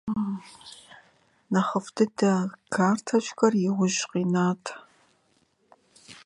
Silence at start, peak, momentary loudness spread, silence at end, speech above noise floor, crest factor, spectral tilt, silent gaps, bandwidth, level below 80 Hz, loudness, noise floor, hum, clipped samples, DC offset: 0.05 s; -6 dBFS; 20 LU; 0.1 s; 42 dB; 20 dB; -5.5 dB/octave; none; 11 kHz; -68 dBFS; -26 LUFS; -67 dBFS; none; under 0.1%; under 0.1%